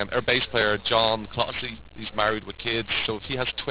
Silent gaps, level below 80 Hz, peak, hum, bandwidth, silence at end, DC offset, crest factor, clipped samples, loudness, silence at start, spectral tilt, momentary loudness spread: none; -48 dBFS; -6 dBFS; none; 4 kHz; 0 s; 0.3%; 20 dB; under 0.1%; -25 LUFS; 0 s; -8 dB/octave; 10 LU